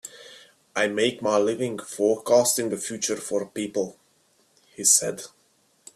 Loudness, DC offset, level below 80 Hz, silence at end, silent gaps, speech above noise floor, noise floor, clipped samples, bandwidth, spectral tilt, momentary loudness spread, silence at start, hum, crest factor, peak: -24 LUFS; under 0.1%; -70 dBFS; 0.7 s; none; 40 dB; -64 dBFS; under 0.1%; 15.5 kHz; -2.5 dB/octave; 15 LU; 0.05 s; none; 22 dB; -4 dBFS